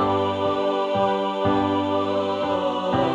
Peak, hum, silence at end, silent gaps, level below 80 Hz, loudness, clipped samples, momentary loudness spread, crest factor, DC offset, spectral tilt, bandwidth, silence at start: -8 dBFS; none; 0 s; none; -54 dBFS; -23 LUFS; under 0.1%; 2 LU; 14 dB; under 0.1%; -7 dB/octave; 9.8 kHz; 0 s